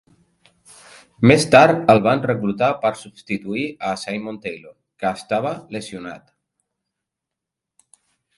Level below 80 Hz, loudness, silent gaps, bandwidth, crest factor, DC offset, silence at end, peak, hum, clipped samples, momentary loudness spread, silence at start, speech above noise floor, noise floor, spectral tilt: -56 dBFS; -18 LUFS; none; 11.5 kHz; 20 dB; under 0.1%; 2.2 s; 0 dBFS; none; under 0.1%; 20 LU; 1.2 s; 66 dB; -84 dBFS; -5.5 dB/octave